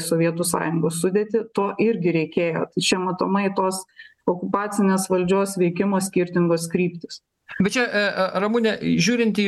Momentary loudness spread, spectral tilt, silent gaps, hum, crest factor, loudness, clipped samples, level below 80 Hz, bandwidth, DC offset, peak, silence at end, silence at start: 5 LU; -5 dB/octave; none; none; 16 dB; -22 LUFS; under 0.1%; -60 dBFS; 12.5 kHz; under 0.1%; -6 dBFS; 0 s; 0 s